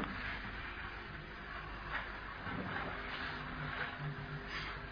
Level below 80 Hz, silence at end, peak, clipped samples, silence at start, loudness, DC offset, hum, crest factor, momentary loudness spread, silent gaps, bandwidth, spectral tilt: -52 dBFS; 0 s; -26 dBFS; under 0.1%; 0 s; -43 LUFS; under 0.1%; none; 18 dB; 5 LU; none; 5.4 kHz; -3 dB/octave